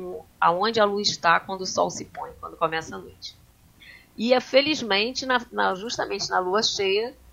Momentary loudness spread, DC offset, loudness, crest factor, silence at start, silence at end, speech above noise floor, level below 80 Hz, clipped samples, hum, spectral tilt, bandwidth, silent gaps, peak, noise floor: 17 LU; under 0.1%; -23 LUFS; 20 dB; 0 s; 0.2 s; 27 dB; -58 dBFS; under 0.1%; none; -2.5 dB/octave; 16 kHz; none; -4 dBFS; -51 dBFS